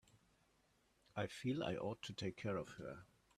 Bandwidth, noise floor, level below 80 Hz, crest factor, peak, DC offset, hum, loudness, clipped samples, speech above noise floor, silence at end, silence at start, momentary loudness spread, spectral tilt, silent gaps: 13.5 kHz; -77 dBFS; -74 dBFS; 20 dB; -26 dBFS; under 0.1%; none; -46 LUFS; under 0.1%; 33 dB; 0.35 s; 0.15 s; 11 LU; -6 dB/octave; none